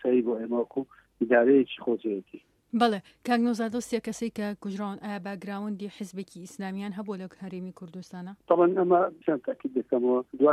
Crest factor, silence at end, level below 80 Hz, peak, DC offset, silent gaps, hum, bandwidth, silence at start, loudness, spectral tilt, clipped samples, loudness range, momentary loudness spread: 18 dB; 0 s; -72 dBFS; -10 dBFS; under 0.1%; none; none; 13 kHz; 0.05 s; -28 LUFS; -6 dB/octave; under 0.1%; 10 LU; 17 LU